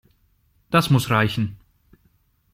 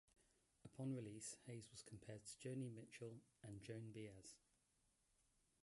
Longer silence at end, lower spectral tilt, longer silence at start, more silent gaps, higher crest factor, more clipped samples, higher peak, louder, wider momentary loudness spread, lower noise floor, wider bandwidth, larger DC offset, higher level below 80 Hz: second, 1 s vs 1.3 s; about the same, -6 dB/octave vs -5.5 dB/octave; first, 0.7 s vs 0.2 s; neither; about the same, 22 dB vs 18 dB; neither; first, -2 dBFS vs -40 dBFS; first, -21 LUFS vs -56 LUFS; second, 9 LU vs 12 LU; second, -63 dBFS vs -84 dBFS; first, 16 kHz vs 11.5 kHz; neither; first, -52 dBFS vs -82 dBFS